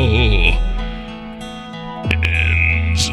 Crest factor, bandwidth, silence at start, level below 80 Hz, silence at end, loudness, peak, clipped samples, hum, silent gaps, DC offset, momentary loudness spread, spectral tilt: 16 dB; 12 kHz; 0 s; -20 dBFS; 0 s; -16 LUFS; 0 dBFS; under 0.1%; none; none; under 0.1%; 16 LU; -4.5 dB/octave